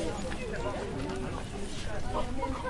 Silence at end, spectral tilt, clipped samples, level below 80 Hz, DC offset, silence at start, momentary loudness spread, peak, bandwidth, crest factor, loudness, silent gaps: 0 s; -5.5 dB/octave; under 0.1%; -40 dBFS; under 0.1%; 0 s; 3 LU; -20 dBFS; 11.5 kHz; 14 dB; -36 LUFS; none